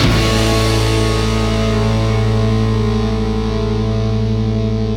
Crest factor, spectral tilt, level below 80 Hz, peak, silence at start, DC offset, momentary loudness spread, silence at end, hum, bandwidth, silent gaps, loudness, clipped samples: 14 dB; -6 dB/octave; -22 dBFS; 0 dBFS; 0 s; under 0.1%; 4 LU; 0 s; none; 15.5 kHz; none; -16 LUFS; under 0.1%